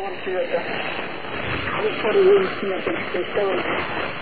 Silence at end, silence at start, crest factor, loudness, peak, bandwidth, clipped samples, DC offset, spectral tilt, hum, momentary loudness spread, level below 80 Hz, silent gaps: 0 s; 0 s; 16 dB; -22 LUFS; -6 dBFS; 4.8 kHz; under 0.1%; 2%; -8.5 dB/octave; none; 10 LU; -50 dBFS; none